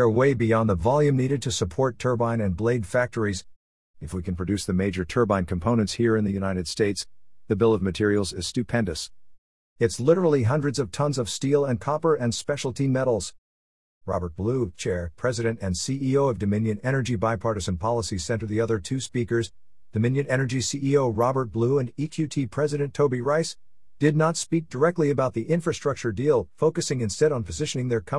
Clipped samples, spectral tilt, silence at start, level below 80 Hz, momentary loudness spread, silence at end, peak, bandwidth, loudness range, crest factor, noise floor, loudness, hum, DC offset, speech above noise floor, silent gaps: under 0.1%; -6 dB/octave; 0 s; -52 dBFS; 7 LU; 0 s; -6 dBFS; 12 kHz; 3 LU; 18 dB; under -90 dBFS; -25 LUFS; none; 0.4%; over 66 dB; 3.56-3.94 s, 9.38-9.76 s, 13.38-14.01 s